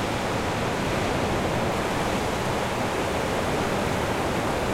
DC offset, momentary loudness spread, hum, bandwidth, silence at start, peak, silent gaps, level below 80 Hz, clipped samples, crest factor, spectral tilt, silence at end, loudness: under 0.1%; 1 LU; none; 16.5 kHz; 0 s; -12 dBFS; none; -40 dBFS; under 0.1%; 12 dB; -5 dB/octave; 0 s; -26 LUFS